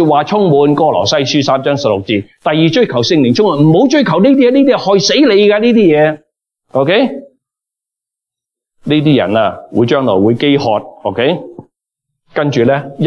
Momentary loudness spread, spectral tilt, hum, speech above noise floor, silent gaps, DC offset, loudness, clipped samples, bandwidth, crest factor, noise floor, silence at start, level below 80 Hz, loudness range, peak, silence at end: 8 LU; -6 dB/octave; none; 74 dB; none; under 0.1%; -11 LUFS; under 0.1%; 7 kHz; 10 dB; -84 dBFS; 0 s; -54 dBFS; 6 LU; 0 dBFS; 0 s